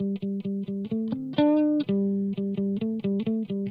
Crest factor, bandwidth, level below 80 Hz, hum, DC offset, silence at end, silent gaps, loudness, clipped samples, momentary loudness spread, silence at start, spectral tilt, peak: 18 dB; 5 kHz; -68 dBFS; none; under 0.1%; 0 s; none; -27 LUFS; under 0.1%; 8 LU; 0 s; -10.5 dB/octave; -8 dBFS